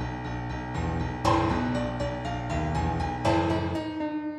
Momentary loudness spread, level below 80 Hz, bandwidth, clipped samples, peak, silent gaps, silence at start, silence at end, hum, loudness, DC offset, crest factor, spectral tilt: 8 LU; -40 dBFS; 12 kHz; under 0.1%; -10 dBFS; none; 0 s; 0 s; none; -28 LUFS; under 0.1%; 16 dB; -6.5 dB/octave